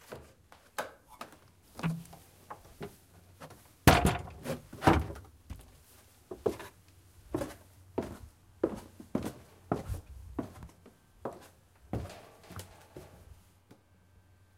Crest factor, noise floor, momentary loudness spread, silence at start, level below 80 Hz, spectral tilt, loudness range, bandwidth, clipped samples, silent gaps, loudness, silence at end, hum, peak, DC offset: 34 dB; -63 dBFS; 25 LU; 0.1 s; -48 dBFS; -5.5 dB/octave; 15 LU; 16.5 kHz; under 0.1%; none; -34 LUFS; 1.25 s; none; -2 dBFS; under 0.1%